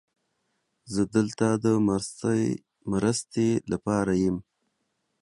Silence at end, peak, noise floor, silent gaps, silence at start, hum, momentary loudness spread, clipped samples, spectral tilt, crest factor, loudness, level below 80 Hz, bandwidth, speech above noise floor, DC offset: 0.8 s; -8 dBFS; -77 dBFS; none; 0.85 s; none; 7 LU; under 0.1%; -6 dB/octave; 18 dB; -26 LUFS; -54 dBFS; 11.5 kHz; 52 dB; under 0.1%